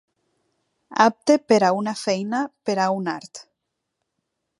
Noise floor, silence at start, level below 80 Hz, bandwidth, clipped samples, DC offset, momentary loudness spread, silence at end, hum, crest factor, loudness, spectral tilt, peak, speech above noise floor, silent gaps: -79 dBFS; 0.9 s; -76 dBFS; 11.5 kHz; under 0.1%; under 0.1%; 12 LU; 1.2 s; none; 22 dB; -21 LUFS; -4.5 dB/octave; -2 dBFS; 59 dB; none